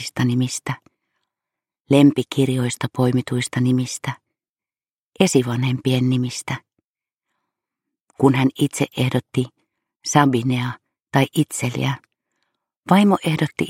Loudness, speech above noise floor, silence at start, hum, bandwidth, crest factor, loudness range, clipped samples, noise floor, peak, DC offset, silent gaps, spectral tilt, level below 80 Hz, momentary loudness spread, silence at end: -20 LUFS; over 71 dB; 0 s; none; 16 kHz; 20 dB; 3 LU; under 0.1%; under -90 dBFS; -2 dBFS; under 0.1%; 1.80-1.84 s, 4.49-4.55 s, 4.92-5.12 s, 6.85-6.95 s, 7.14-7.18 s, 8.00-8.07 s, 9.96-10.00 s, 12.77-12.83 s; -5.5 dB/octave; -60 dBFS; 13 LU; 0 s